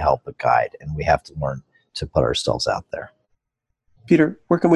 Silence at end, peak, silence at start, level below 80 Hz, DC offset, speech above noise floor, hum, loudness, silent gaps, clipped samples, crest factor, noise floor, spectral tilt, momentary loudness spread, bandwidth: 0 s; -4 dBFS; 0 s; -40 dBFS; under 0.1%; 58 dB; none; -21 LUFS; none; under 0.1%; 18 dB; -78 dBFS; -6 dB/octave; 16 LU; 11.5 kHz